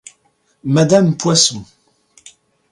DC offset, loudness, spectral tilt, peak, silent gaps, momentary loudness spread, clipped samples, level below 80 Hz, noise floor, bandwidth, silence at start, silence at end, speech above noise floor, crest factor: under 0.1%; -13 LUFS; -4.5 dB/octave; 0 dBFS; none; 15 LU; under 0.1%; -56 dBFS; -61 dBFS; 11.5 kHz; 0.65 s; 1.1 s; 47 dB; 18 dB